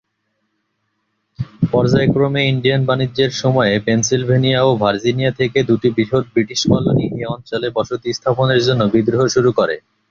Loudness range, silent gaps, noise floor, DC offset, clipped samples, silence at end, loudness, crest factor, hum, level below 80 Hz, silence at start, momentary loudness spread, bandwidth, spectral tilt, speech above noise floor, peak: 2 LU; none; -70 dBFS; under 0.1%; under 0.1%; 0.3 s; -16 LUFS; 14 dB; none; -46 dBFS; 1.4 s; 7 LU; 7.4 kHz; -5.5 dB/octave; 54 dB; -2 dBFS